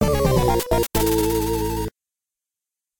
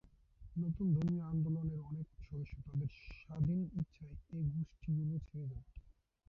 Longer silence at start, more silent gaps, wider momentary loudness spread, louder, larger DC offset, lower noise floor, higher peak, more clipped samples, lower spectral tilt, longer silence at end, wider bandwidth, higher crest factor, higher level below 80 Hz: second, 0 s vs 0.4 s; neither; second, 8 LU vs 13 LU; first, -21 LUFS vs -40 LUFS; neither; first, -88 dBFS vs -59 dBFS; first, -6 dBFS vs -26 dBFS; neither; second, -5.5 dB/octave vs -11 dB/octave; second, 0 s vs 0.4 s; first, 19 kHz vs 5.6 kHz; about the same, 16 dB vs 14 dB; first, -32 dBFS vs -56 dBFS